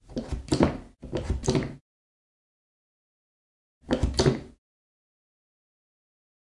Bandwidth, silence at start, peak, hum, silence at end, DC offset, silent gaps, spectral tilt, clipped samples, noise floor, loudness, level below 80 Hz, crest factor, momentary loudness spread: 11.5 kHz; 0.1 s; -4 dBFS; none; 2.05 s; under 0.1%; 1.81-3.81 s; -6 dB/octave; under 0.1%; under -90 dBFS; -28 LUFS; -40 dBFS; 28 dB; 11 LU